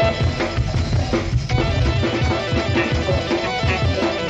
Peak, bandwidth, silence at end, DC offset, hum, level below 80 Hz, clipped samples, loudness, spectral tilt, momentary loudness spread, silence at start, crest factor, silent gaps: -6 dBFS; 8.4 kHz; 0 s; under 0.1%; none; -28 dBFS; under 0.1%; -20 LUFS; -6 dB/octave; 2 LU; 0 s; 12 dB; none